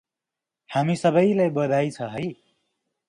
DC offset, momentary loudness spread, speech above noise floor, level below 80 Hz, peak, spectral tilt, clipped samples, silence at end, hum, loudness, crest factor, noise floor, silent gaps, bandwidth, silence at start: under 0.1%; 11 LU; 66 dB; -66 dBFS; -8 dBFS; -7 dB/octave; under 0.1%; 0.75 s; none; -23 LUFS; 18 dB; -87 dBFS; none; 11 kHz; 0.7 s